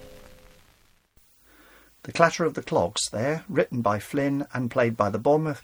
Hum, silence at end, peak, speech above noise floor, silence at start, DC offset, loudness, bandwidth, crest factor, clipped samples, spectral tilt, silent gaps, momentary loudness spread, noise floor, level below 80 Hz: none; 0 s; -2 dBFS; 36 dB; 0 s; under 0.1%; -25 LUFS; over 20 kHz; 24 dB; under 0.1%; -5 dB/octave; none; 6 LU; -61 dBFS; -58 dBFS